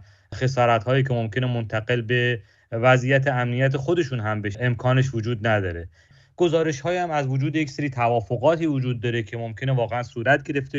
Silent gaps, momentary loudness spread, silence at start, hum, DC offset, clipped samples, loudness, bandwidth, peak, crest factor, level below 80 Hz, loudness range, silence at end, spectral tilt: none; 7 LU; 0 s; none; under 0.1%; under 0.1%; -23 LUFS; 7.6 kHz; -4 dBFS; 18 dB; -54 dBFS; 2 LU; 0 s; -7 dB/octave